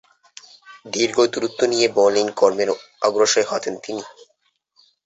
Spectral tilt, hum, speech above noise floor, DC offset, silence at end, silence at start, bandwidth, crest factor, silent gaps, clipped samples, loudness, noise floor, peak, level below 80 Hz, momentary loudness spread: -2.5 dB/octave; none; 48 dB; under 0.1%; 0.95 s; 0.7 s; 8.2 kHz; 18 dB; none; under 0.1%; -19 LUFS; -67 dBFS; -2 dBFS; -66 dBFS; 13 LU